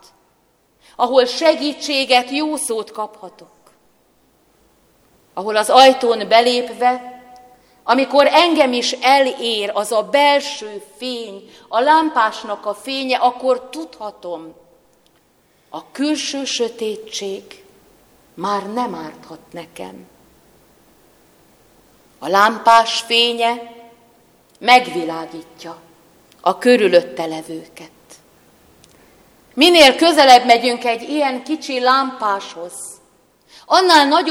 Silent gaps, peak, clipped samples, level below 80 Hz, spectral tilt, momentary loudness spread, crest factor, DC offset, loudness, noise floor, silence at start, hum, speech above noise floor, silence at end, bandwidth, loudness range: none; 0 dBFS; under 0.1%; -62 dBFS; -2 dB/octave; 21 LU; 18 dB; under 0.1%; -15 LUFS; -59 dBFS; 1 s; none; 43 dB; 0 s; 17 kHz; 13 LU